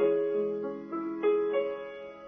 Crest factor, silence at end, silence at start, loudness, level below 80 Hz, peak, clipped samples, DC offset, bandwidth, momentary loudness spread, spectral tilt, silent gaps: 14 dB; 0 s; 0 s; -31 LUFS; -74 dBFS; -16 dBFS; under 0.1%; under 0.1%; 3.6 kHz; 10 LU; -8 dB/octave; none